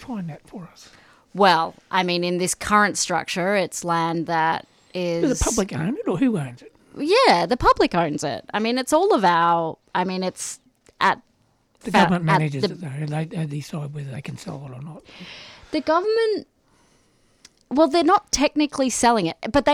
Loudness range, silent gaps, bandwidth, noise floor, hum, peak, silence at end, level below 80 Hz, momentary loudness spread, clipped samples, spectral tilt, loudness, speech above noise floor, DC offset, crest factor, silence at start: 7 LU; none; 18.5 kHz; -63 dBFS; none; -4 dBFS; 0 s; -44 dBFS; 17 LU; under 0.1%; -4.5 dB/octave; -21 LUFS; 42 dB; under 0.1%; 18 dB; 0 s